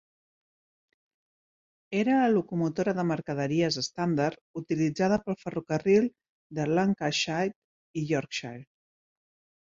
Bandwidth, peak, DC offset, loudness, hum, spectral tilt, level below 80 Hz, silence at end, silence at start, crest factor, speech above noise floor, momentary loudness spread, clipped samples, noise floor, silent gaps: 7.8 kHz; -12 dBFS; under 0.1%; -28 LUFS; none; -5.5 dB/octave; -66 dBFS; 1 s; 1.9 s; 18 dB; over 63 dB; 11 LU; under 0.1%; under -90 dBFS; 4.41-4.54 s, 6.29-6.50 s, 7.56-7.94 s